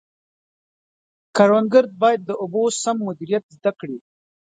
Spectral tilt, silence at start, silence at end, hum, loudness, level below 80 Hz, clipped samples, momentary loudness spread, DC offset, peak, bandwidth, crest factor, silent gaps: -5 dB/octave; 1.35 s; 0.6 s; none; -19 LUFS; -72 dBFS; under 0.1%; 12 LU; under 0.1%; 0 dBFS; 9.4 kHz; 20 dB; 3.43-3.49 s